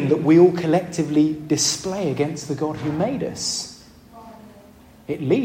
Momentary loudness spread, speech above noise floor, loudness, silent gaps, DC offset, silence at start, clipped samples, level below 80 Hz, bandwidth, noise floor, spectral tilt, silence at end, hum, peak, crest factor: 13 LU; 28 dB; -20 LUFS; none; under 0.1%; 0 s; under 0.1%; -56 dBFS; 16 kHz; -47 dBFS; -5 dB/octave; 0 s; none; -4 dBFS; 18 dB